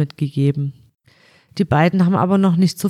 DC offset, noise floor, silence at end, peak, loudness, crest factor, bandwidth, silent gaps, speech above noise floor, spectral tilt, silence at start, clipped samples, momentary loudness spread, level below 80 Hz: under 0.1%; -53 dBFS; 0 s; -2 dBFS; -17 LUFS; 16 dB; 14 kHz; none; 37 dB; -7.5 dB/octave; 0 s; under 0.1%; 11 LU; -52 dBFS